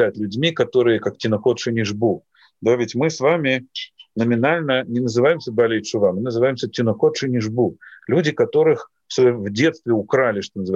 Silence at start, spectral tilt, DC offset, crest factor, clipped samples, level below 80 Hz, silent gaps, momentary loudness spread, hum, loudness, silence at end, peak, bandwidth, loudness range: 0 s; -6 dB/octave; under 0.1%; 14 dB; under 0.1%; -64 dBFS; none; 6 LU; none; -19 LUFS; 0 s; -4 dBFS; 7.8 kHz; 1 LU